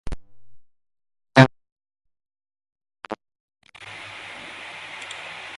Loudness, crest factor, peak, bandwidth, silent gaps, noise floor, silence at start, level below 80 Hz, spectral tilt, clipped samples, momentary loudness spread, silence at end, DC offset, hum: -20 LUFS; 26 dB; 0 dBFS; 11.5 kHz; 1.72-1.76 s, 2.72-2.76 s, 3.40-3.48 s; -44 dBFS; 0.05 s; -48 dBFS; -6 dB/octave; under 0.1%; 24 LU; 0 s; under 0.1%; none